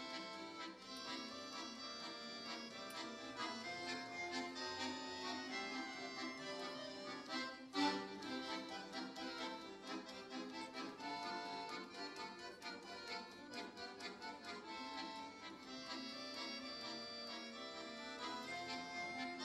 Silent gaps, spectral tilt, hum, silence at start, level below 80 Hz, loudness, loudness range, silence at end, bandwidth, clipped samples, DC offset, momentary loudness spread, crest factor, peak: none; -2.5 dB/octave; none; 0 s; -82 dBFS; -47 LUFS; 5 LU; 0 s; 13 kHz; under 0.1%; under 0.1%; 6 LU; 22 dB; -26 dBFS